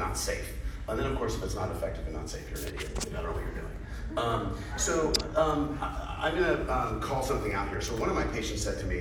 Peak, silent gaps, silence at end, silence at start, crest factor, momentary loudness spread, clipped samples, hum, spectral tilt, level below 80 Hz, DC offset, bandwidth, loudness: -10 dBFS; none; 0 s; 0 s; 22 dB; 10 LU; under 0.1%; none; -4.5 dB/octave; -38 dBFS; under 0.1%; over 20 kHz; -32 LUFS